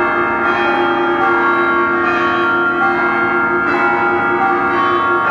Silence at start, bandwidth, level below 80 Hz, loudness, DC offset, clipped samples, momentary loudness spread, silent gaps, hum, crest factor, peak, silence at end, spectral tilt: 0 s; 7 kHz; -48 dBFS; -14 LUFS; under 0.1%; under 0.1%; 1 LU; none; none; 12 dB; -2 dBFS; 0 s; -6 dB/octave